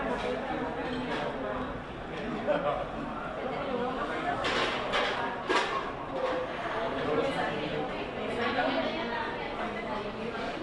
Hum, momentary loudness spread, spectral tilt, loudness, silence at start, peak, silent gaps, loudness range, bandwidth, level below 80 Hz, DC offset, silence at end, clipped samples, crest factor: none; 7 LU; -5 dB/octave; -32 LUFS; 0 s; -12 dBFS; none; 3 LU; 11.5 kHz; -52 dBFS; under 0.1%; 0 s; under 0.1%; 20 dB